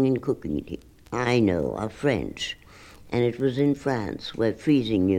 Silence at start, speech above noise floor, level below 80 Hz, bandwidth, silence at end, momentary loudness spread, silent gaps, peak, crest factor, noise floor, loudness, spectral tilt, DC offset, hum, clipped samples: 0 s; 23 dB; -50 dBFS; 11.5 kHz; 0 s; 10 LU; none; -8 dBFS; 16 dB; -48 dBFS; -26 LUFS; -6.5 dB/octave; under 0.1%; none; under 0.1%